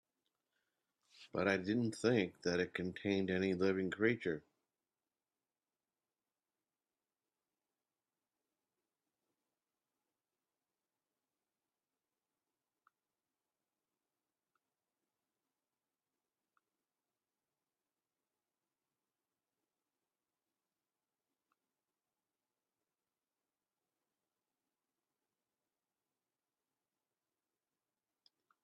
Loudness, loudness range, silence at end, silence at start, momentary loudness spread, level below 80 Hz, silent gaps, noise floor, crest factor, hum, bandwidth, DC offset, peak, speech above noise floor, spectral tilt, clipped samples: -37 LUFS; 8 LU; 24.25 s; 1.2 s; 6 LU; -84 dBFS; none; under -90 dBFS; 26 dB; none; 10.5 kHz; under 0.1%; -20 dBFS; over 53 dB; -6 dB/octave; under 0.1%